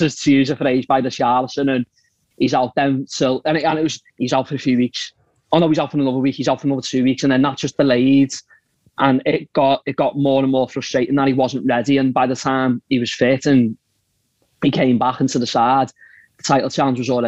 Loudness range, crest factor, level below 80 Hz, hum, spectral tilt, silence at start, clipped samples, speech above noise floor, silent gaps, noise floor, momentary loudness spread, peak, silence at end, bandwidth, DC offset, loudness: 2 LU; 18 dB; -60 dBFS; none; -5.5 dB/octave; 0 s; under 0.1%; 50 dB; none; -67 dBFS; 6 LU; 0 dBFS; 0 s; 8.2 kHz; 0.2%; -18 LUFS